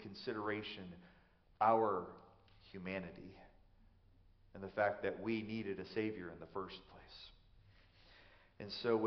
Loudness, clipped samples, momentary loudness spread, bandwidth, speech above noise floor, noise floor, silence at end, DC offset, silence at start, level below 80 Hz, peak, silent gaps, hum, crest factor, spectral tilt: -41 LUFS; under 0.1%; 21 LU; 6.2 kHz; 27 dB; -67 dBFS; 0 s; under 0.1%; 0 s; -70 dBFS; -20 dBFS; none; none; 24 dB; -4 dB/octave